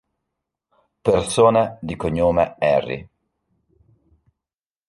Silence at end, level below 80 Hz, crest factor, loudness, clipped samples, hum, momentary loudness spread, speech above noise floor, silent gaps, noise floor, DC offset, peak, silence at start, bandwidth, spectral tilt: 1.85 s; -46 dBFS; 20 dB; -19 LUFS; under 0.1%; none; 11 LU; over 72 dB; none; under -90 dBFS; under 0.1%; -2 dBFS; 1.05 s; 11.5 kHz; -5.5 dB/octave